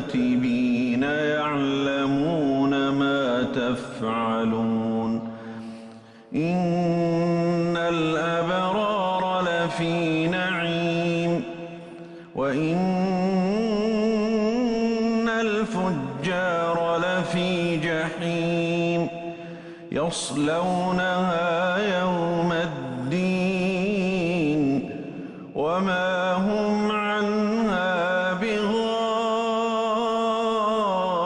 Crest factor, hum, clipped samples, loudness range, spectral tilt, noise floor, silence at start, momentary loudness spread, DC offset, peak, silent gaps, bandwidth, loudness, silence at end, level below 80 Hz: 10 dB; none; under 0.1%; 2 LU; -6 dB/octave; -45 dBFS; 0 s; 6 LU; under 0.1%; -14 dBFS; none; 10.5 kHz; -24 LUFS; 0 s; -56 dBFS